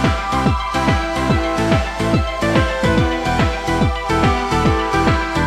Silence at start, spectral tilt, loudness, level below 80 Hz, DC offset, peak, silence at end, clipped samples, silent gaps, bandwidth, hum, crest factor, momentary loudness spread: 0 s; -6 dB/octave; -17 LUFS; -26 dBFS; under 0.1%; -2 dBFS; 0 s; under 0.1%; none; 15 kHz; none; 14 dB; 2 LU